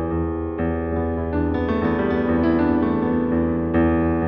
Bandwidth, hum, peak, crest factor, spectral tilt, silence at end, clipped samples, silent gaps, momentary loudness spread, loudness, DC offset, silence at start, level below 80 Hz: 5.4 kHz; none; -8 dBFS; 12 dB; -11 dB/octave; 0 s; under 0.1%; none; 5 LU; -21 LUFS; under 0.1%; 0 s; -34 dBFS